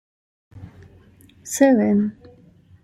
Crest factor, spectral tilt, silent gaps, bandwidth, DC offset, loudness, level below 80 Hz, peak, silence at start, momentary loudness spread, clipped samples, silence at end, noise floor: 20 dB; -6 dB/octave; none; 15.5 kHz; under 0.1%; -19 LUFS; -60 dBFS; -4 dBFS; 0.55 s; 15 LU; under 0.1%; 0.7 s; -51 dBFS